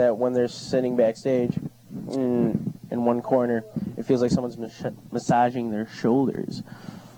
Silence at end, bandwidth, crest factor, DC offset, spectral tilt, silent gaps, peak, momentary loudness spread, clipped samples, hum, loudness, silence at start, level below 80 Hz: 0 s; 17.5 kHz; 16 dB; under 0.1%; -7 dB/octave; none; -8 dBFS; 12 LU; under 0.1%; none; -25 LUFS; 0 s; -58 dBFS